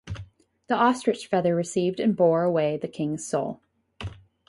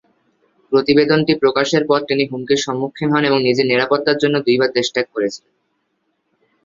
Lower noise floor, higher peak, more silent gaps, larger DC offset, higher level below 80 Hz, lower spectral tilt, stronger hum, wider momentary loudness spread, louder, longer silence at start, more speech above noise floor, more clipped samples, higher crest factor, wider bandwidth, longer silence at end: second, -48 dBFS vs -69 dBFS; second, -8 dBFS vs -2 dBFS; neither; neither; about the same, -54 dBFS vs -58 dBFS; about the same, -6 dB/octave vs -5 dB/octave; neither; first, 18 LU vs 7 LU; second, -25 LUFS vs -16 LUFS; second, 0.05 s vs 0.7 s; second, 24 dB vs 53 dB; neither; about the same, 18 dB vs 16 dB; first, 11.5 kHz vs 7.6 kHz; second, 0.35 s vs 1.3 s